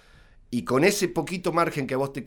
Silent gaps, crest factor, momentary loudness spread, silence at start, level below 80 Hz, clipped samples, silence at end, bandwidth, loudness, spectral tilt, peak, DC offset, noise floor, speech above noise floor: none; 20 dB; 8 LU; 0.5 s; -54 dBFS; under 0.1%; 0 s; over 20 kHz; -25 LUFS; -5 dB/octave; -6 dBFS; under 0.1%; -53 dBFS; 28 dB